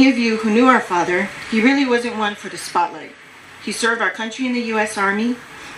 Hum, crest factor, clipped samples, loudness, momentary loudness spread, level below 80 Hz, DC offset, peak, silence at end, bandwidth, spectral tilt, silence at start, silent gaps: none; 18 dB; under 0.1%; -18 LUFS; 13 LU; -60 dBFS; under 0.1%; 0 dBFS; 0 s; 14.5 kHz; -4 dB/octave; 0 s; none